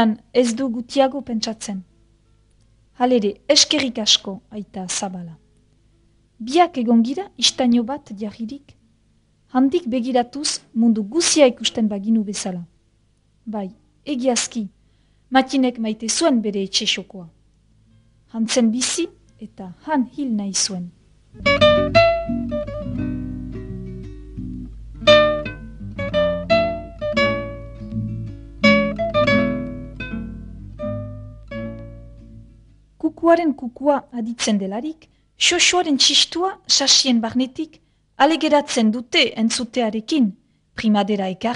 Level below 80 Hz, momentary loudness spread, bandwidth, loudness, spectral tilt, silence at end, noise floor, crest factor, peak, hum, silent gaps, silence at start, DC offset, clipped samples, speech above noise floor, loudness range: -44 dBFS; 19 LU; 11 kHz; -19 LUFS; -3 dB/octave; 0 s; -60 dBFS; 20 dB; 0 dBFS; none; none; 0 s; under 0.1%; under 0.1%; 41 dB; 7 LU